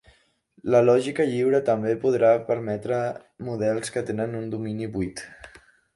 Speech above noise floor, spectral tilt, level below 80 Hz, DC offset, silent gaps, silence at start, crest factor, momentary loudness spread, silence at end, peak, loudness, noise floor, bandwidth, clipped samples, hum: 37 dB; -6.5 dB/octave; -58 dBFS; under 0.1%; none; 0.65 s; 18 dB; 13 LU; 0.5 s; -6 dBFS; -24 LUFS; -61 dBFS; 11.5 kHz; under 0.1%; none